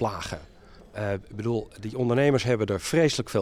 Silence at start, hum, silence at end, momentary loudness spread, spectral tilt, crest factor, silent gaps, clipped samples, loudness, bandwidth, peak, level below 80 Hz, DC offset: 0 s; none; 0 s; 13 LU; -5.5 dB/octave; 16 dB; none; under 0.1%; -26 LUFS; 15 kHz; -10 dBFS; -52 dBFS; under 0.1%